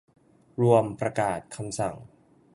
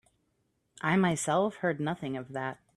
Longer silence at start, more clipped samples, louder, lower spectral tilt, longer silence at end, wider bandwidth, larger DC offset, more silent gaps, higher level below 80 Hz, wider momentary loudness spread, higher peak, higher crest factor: second, 0.6 s vs 0.85 s; neither; first, -26 LUFS vs -30 LUFS; about the same, -6.5 dB/octave vs -5.5 dB/octave; first, 0.5 s vs 0.25 s; second, 11.5 kHz vs 13 kHz; neither; neither; first, -60 dBFS vs -68 dBFS; first, 15 LU vs 10 LU; first, -6 dBFS vs -12 dBFS; about the same, 22 dB vs 18 dB